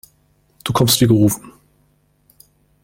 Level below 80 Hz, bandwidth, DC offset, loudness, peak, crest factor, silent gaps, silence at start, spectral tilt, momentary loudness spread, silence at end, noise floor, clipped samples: -46 dBFS; 16.5 kHz; under 0.1%; -15 LUFS; -2 dBFS; 18 dB; none; 0.65 s; -5 dB/octave; 15 LU; 1.35 s; -59 dBFS; under 0.1%